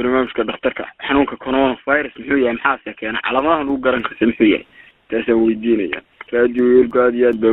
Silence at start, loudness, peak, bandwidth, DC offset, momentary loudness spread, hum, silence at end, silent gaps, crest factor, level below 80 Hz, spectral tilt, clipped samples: 0 s; -17 LUFS; 0 dBFS; 4.1 kHz; under 0.1%; 9 LU; none; 0 s; none; 16 dB; -46 dBFS; -8.5 dB/octave; under 0.1%